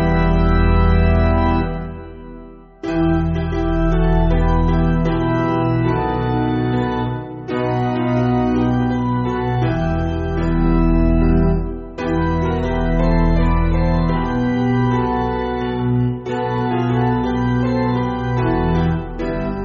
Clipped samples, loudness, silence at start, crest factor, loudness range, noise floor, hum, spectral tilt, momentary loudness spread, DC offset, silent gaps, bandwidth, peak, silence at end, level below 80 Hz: under 0.1%; -18 LUFS; 0 s; 14 dB; 1 LU; -38 dBFS; none; -7.5 dB/octave; 7 LU; under 0.1%; none; 6.6 kHz; -4 dBFS; 0 s; -24 dBFS